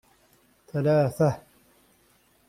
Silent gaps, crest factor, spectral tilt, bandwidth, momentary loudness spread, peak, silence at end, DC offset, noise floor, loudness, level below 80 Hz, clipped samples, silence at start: none; 18 dB; -8 dB/octave; 15.5 kHz; 13 LU; -10 dBFS; 1.1 s; under 0.1%; -63 dBFS; -25 LUFS; -62 dBFS; under 0.1%; 0.75 s